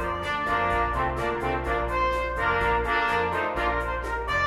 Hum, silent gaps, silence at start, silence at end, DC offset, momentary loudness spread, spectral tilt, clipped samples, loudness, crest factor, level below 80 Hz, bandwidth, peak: none; none; 0 s; 0 s; under 0.1%; 4 LU; -5.5 dB/octave; under 0.1%; -26 LUFS; 14 dB; -36 dBFS; 15.5 kHz; -12 dBFS